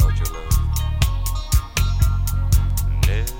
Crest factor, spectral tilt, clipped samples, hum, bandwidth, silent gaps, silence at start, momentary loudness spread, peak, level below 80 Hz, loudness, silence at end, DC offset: 14 dB; -4.5 dB/octave; under 0.1%; none; 17 kHz; none; 0 s; 3 LU; -4 dBFS; -20 dBFS; -21 LUFS; 0 s; under 0.1%